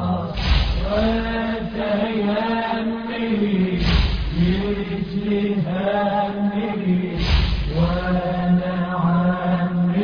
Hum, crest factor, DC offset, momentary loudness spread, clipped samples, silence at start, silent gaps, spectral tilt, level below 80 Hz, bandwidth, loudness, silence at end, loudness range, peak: none; 14 dB; under 0.1%; 4 LU; under 0.1%; 0 s; none; -8 dB/octave; -28 dBFS; 5.4 kHz; -21 LUFS; 0 s; 1 LU; -6 dBFS